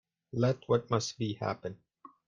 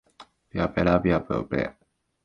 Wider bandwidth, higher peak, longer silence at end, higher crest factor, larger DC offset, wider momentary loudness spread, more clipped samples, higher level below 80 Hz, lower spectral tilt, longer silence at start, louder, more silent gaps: first, 9.2 kHz vs 6.8 kHz; second, -14 dBFS vs -6 dBFS; second, 0.2 s vs 0.55 s; about the same, 20 dB vs 22 dB; neither; first, 13 LU vs 10 LU; neither; second, -66 dBFS vs -44 dBFS; second, -6 dB/octave vs -8.5 dB/octave; first, 0.35 s vs 0.2 s; second, -33 LUFS vs -25 LUFS; neither